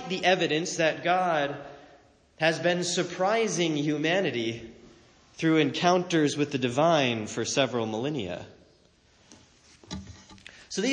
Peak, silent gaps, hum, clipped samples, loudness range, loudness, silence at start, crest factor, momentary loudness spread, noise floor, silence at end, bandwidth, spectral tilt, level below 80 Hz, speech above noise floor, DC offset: -10 dBFS; none; none; under 0.1%; 7 LU; -26 LUFS; 0 s; 18 dB; 18 LU; -61 dBFS; 0 s; 10 kHz; -4 dB/octave; -64 dBFS; 35 dB; under 0.1%